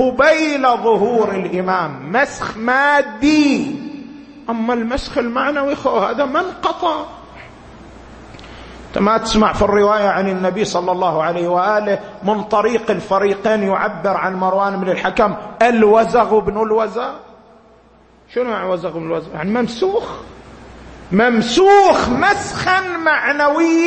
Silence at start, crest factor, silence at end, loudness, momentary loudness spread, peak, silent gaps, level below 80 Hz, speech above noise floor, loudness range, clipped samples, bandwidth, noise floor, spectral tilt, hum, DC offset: 0 s; 16 dB; 0 s; -16 LUFS; 11 LU; 0 dBFS; none; -42 dBFS; 33 dB; 7 LU; under 0.1%; 8.8 kHz; -48 dBFS; -5 dB/octave; none; under 0.1%